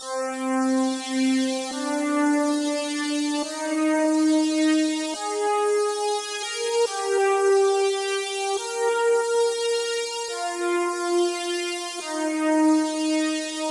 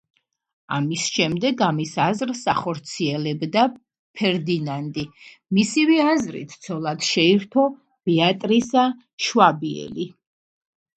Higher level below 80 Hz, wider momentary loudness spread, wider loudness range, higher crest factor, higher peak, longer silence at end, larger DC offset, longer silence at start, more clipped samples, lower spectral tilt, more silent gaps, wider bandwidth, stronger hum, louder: second, -78 dBFS vs -62 dBFS; second, 6 LU vs 13 LU; about the same, 2 LU vs 4 LU; second, 12 dB vs 22 dB; second, -12 dBFS vs 0 dBFS; second, 0 s vs 0.9 s; neither; second, 0 s vs 0.7 s; neither; second, -1 dB/octave vs -4.5 dB/octave; second, none vs 3.99-4.14 s, 9.13-9.18 s; first, 11.5 kHz vs 9.2 kHz; neither; about the same, -23 LUFS vs -21 LUFS